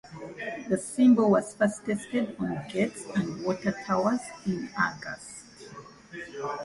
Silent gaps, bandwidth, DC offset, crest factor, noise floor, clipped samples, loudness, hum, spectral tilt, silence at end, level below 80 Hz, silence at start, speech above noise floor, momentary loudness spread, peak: none; 11.5 kHz; under 0.1%; 18 dB; -47 dBFS; under 0.1%; -28 LUFS; none; -6 dB/octave; 0 s; -62 dBFS; 0.05 s; 20 dB; 21 LU; -12 dBFS